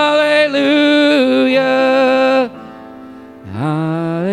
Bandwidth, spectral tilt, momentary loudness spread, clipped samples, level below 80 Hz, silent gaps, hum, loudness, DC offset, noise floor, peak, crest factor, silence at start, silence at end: 12 kHz; -6 dB/octave; 12 LU; under 0.1%; -58 dBFS; none; none; -13 LUFS; under 0.1%; -34 dBFS; -2 dBFS; 12 dB; 0 s; 0 s